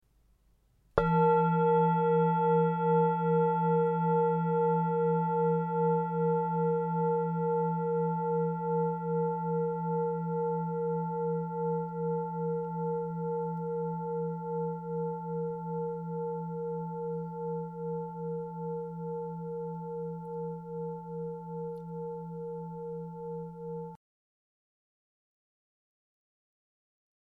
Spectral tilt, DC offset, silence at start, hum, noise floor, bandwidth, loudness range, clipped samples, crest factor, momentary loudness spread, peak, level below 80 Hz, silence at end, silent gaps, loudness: -11.5 dB/octave; under 0.1%; 0.95 s; none; -67 dBFS; 3.6 kHz; 14 LU; under 0.1%; 22 dB; 13 LU; -8 dBFS; -62 dBFS; 3.3 s; none; -31 LUFS